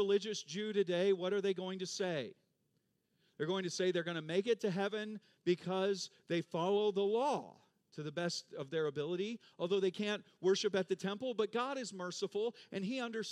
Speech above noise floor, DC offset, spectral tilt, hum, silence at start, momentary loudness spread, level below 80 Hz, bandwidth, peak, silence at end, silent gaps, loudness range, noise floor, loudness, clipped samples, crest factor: 44 dB; under 0.1%; -4.5 dB/octave; none; 0 s; 9 LU; under -90 dBFS; 11 kHz; -20 dBFS; 0 s; none; 2 LU; -80 dBFS; -37 LUFS; under 0.1%; 16 dB